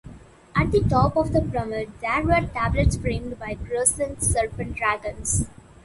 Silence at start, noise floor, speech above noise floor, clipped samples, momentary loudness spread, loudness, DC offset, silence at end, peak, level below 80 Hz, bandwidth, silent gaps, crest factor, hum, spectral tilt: 0.05 s; -44 dBFS; 21 dB; under 0.1%; 9 LU; -23 LUFS; under 0.1%; 0.3 s; -4 dBFS; -34 dBFS; 12 kHz; none; 18 dB; none; -5 dB/octave